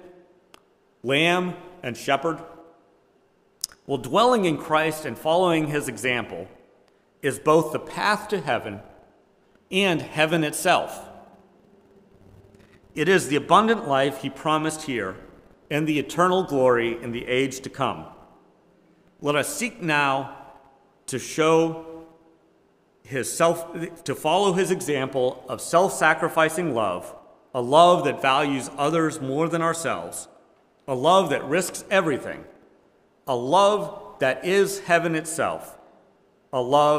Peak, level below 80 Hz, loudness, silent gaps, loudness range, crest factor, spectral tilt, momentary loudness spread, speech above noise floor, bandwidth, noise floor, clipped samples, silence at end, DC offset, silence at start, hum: 0 dBFS; -62 dBFS; -23 LUFS; none; 5 LU; 24 dB; -4.5 dB/octave; 15 LU; 40 dB; 16 kHz; -62 dBFS; under 0.1%; 0 s; under 0.1%; 0.05 s; none